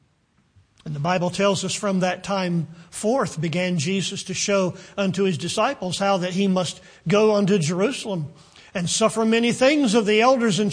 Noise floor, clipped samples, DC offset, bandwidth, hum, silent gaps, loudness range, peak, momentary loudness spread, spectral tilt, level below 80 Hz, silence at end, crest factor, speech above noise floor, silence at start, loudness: -64 dBFS; under 0.1%; under 0.1%; 10.5 kHz; none; none; 4 LU; -4 dBFS; 10 LU; -4.5 dB/octave; -60 dBFS; 0 s; 18 dB; 42 dB; 0.85 s; -21 LUFS